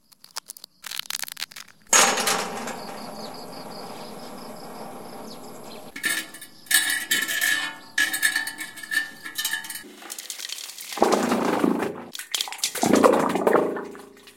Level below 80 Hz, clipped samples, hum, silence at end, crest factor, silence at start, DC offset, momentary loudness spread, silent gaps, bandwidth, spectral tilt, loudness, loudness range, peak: -68 dBFS; under 0.1%; none; 0.05 s; 26 dB; 0.35 s; under 0.1%; 20 LU; none; 17 kHz; -1.5 dB/octave; -23 LUFS; 10 LU; 0 dBFS